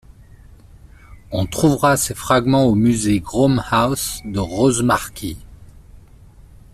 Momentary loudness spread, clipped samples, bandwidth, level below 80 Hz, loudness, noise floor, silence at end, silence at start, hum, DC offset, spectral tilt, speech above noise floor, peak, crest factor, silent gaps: 12 LU; under 0.1%; 15 kHz; -40 dBFS; -17 LUFS; -44 dBFS; 0.8 s; 0.2 s; none; under 0.1%; -5 dB/octave; 27 dB; -2 dBFS; 18 dB; none